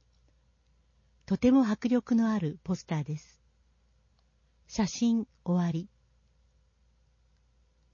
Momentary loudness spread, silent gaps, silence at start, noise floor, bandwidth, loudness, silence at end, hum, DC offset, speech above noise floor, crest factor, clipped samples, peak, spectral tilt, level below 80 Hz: 14 LU; none; 1.3 s; -68 dBFS; 7.2 kHz; -29 LUFS; 2.1 s; none; under 0.1%; 40 dB; 18 dB; under 0.1%; -14 dBFS; -6.5 dB/octave; -60 dBFS